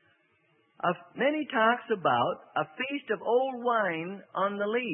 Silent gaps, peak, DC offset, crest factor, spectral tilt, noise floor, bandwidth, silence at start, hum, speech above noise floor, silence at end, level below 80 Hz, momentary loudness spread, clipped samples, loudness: none; -12 dBFS; under 0.1%; 18 dB; -9 dB/octave; -69 dBFS; 3.7 kHz; 0.85 s; none; 40 dB; 0 s; -80 dBFS; 7 LU; under 0.1%; -29 LUFS